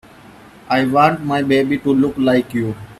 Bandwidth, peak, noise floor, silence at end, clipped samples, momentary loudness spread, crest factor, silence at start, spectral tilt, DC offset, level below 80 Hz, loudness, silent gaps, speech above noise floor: 13.5 kHz; 0 dBFS; -42 dBFS; 0.05 s; under 0.1%; 6 LU; 16 dB; 0.65 s; -7 dB/octave; under 0.1%; -50 dBFS; -16 LUFS; none; 26 dB